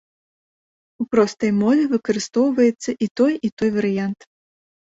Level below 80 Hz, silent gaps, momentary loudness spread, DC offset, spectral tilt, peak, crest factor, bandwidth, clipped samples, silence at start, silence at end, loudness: -62 dBFS; 3.11-3.15 s, 3.52-3.57 s; 7 LU; under 0.1%; -6 dB/octave; -2 dBFS; 18 dB; 8 kHz; under 0.1%; 1 s; 0.8 s; -20 LUFS